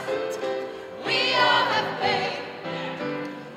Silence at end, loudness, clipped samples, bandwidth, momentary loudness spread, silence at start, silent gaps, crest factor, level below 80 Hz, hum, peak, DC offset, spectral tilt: 0 s; -25 LUFS; under 0.1%; 15.5 kHz; 14 LU; 0 s; none; 18 dB; -72 dBFS; none; -8 dBFS; under 0.1%; -3.5 dB/octave